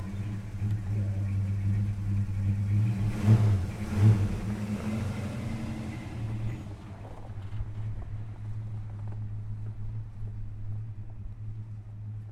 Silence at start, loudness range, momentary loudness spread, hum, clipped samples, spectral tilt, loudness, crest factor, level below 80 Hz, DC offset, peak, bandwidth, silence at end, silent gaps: 0 s; 12 LU; 17 LU; none; under 0.1%; -8 dB/octave; -31 LUFS; 18 dB; -44 dBFS; under 0.1%; -12 dBFS; 9.6 kHz; 0 s; none